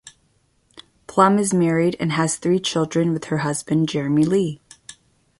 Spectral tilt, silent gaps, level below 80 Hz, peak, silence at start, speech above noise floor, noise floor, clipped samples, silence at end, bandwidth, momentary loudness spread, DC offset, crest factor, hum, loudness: -5.5 dB/octave; none; -58 dBFS; -2 dBFS; 0.05 s; 44 dB; -63 dBFS; under 0.1%; 0.5 s; 11.5 kHz; 7 LU; under 0.1%; 20 dB; none; -20 LUFS